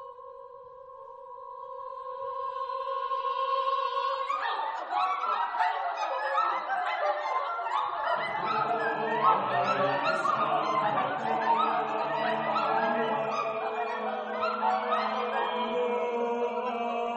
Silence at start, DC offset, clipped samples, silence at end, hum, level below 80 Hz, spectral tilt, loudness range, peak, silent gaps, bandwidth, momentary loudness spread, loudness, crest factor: 0 s; under 0.1%; under 0.1%; 0 s; none; -76 dBFS; -4.5 dB/octave; 5 LU; -12 dBFS; none; 9.4 kHz; 13 LU; -29 LUFS; 18 dB